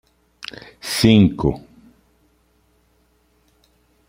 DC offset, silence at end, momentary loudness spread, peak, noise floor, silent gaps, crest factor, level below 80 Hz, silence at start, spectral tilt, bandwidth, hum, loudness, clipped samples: under 0.1%; 2.5 s; 22 LU; -2 dBFS; -61 dBFS; none; 20 dB; -44 dBFS; 0.85 s; -6 dB/octave; 16 kHz; none; -16 LUFS; under 0.1%